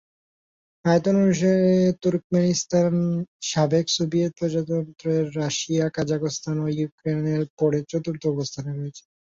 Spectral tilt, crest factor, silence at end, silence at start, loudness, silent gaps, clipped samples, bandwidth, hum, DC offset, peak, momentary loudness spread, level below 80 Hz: -6 dB/octave; 18 dB; 0.4 s; 0.85 s; -23 LUFS; 2.24-2.30 s, 3.28-3.40 s, 6.92-6.98 s, 7.50-7.57 s; under 0.1%; 7.8 kHz; none; under 0.1%; -6 dBFS; 8 LU; -60 dBFS